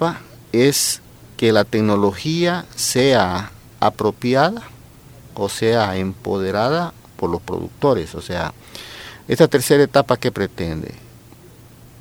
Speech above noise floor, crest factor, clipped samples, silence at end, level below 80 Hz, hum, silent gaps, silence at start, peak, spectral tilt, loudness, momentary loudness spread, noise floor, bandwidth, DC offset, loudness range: 26 dB; 20 dB; under 0.1%; 0.95 s; -48 dBFS; none; none; 0 s; 0 dBFS; -4.5 dB/octave; -19 LUFS; 17 LU; -44 dBFS; over 20 kHz; under 0.1%; 4 LU